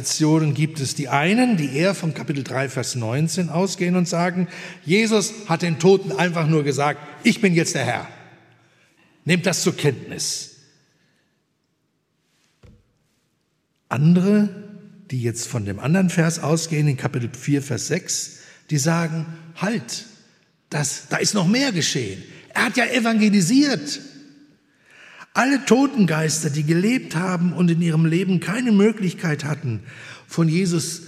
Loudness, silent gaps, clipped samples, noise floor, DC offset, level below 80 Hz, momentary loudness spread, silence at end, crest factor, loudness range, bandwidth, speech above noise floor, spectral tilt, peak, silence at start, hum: -20 LUFS; none; under 0.1%; -70 dBFS; under 0.1%; -68 dBFS; 11 LU; 0 s; 20 dB; 6 LU; 15 kHz; 50 dB; -5 dB/octave; -2 dBFS; 0 s; none